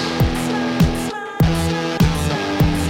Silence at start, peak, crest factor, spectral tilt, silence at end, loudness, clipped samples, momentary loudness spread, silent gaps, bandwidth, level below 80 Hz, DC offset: 0 s; -4 dBFS; 14 dB; -6 dB/octave; 0 s; -19 LUFS; under 0.1%; 3 LU; none; 17 kHz; -28 dBFS; under 0.1%